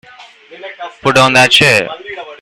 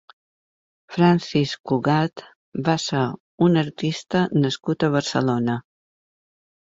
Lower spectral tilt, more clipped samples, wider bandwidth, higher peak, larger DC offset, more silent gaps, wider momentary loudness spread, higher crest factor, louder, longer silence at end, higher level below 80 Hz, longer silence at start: second, -3 dB/octave vs -6 dB/octave; first, 0.2% vs under 0.1%; first, over 20 kHz vs 7.8 kHz; first, 0 dBFS vs -4 dBFS; neither; second, none vs 1.60-1.64 s, 2.36-2.52 s, 3.20-3.38 s; first, 22 LU vs 9 LU; about the same, 14 dB vs 18 dB; first, -8 LUFS vs -22 LUFS; second, 0.05 s vs 1.15 s; first, -50 dBFS vs -60 dBFS; second, 0.2 s vs 0.9 s